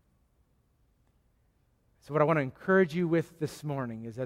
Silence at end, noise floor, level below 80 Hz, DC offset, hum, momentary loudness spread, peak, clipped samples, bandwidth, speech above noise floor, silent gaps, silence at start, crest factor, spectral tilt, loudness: 0 s; -70 dBFS; -68 dBFS; under 0.1%; none; 11 LU; -10 dBFS; under 0.1%; 15.5 kHz; 41 dB; none; 2.1 s; 22 dB; -7.5 dB/octave; -29 LUFS